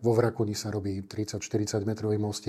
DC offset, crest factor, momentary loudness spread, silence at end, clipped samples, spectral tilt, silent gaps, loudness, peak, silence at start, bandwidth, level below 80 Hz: under 0.1%; 16 dB; 8 LU; 0 s; under 0.1%; -6 dB/octave; none; -30 LUFS; -12 dBFS; 0 s; 14.5 kHz; -64 dBFS